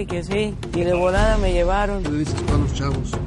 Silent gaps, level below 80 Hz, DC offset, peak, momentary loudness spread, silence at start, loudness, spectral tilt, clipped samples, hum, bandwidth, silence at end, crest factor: none; -26 dBFS; under 0.1%; -4 dBFS; 6 LU; 0 s; -21 LUFS; -6.5 dB/octave; under 0.1%; none; 11.5 kHz; 0 s; 16 dB